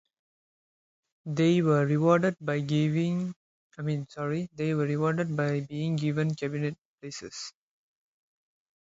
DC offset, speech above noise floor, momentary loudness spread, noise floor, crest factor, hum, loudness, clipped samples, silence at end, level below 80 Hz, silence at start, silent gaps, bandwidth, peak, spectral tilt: under 0.1%; over 63 dB; 15 LU; under -90 dBFS; 20 dB; none; -28 LUFS; under 0.1%; 1.3 s; -68 dBFS; 1.25 s; 3.36-3.70 s, 6.78-6.98 s; 7.8 kHz; -8 dBFS; -7 dB/octave